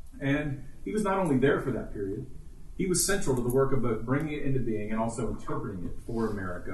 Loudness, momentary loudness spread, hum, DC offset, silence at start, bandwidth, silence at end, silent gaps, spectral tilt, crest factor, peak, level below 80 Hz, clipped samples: -30 LUFS; 11 LU; none; under 0.1%; 0.05 s; 12 kHz; 0 s; none; -5.5 dB/octave; 16 dB; -12 dBFS; -42 dBFS; under 0.1%